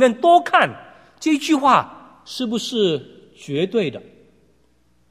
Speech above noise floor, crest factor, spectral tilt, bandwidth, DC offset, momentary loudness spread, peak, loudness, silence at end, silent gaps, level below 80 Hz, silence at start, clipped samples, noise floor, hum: 43 dB; 20 dB; -4.5 dB/octave; 14.5 kHz; under 0.1%; 20 LU; 0 dBFS; -19 LUFS; 1.1 s; none; -64 dBFS; 0 s; under 0.1%; -61 dBFS; none